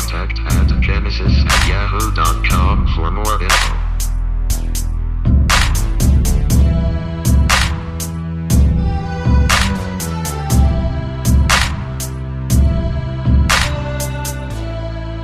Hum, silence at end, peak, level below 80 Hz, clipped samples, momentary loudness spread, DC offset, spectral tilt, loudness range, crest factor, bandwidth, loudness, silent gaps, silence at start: none; 0 s; 0 dBFS; -16 dBFS; under 0.1%; 10 LU; under 0.1%; -4.5 dB/octave; 2 LU; 14 dB; 15.5 kHz; -16 LUFS; none; 0 s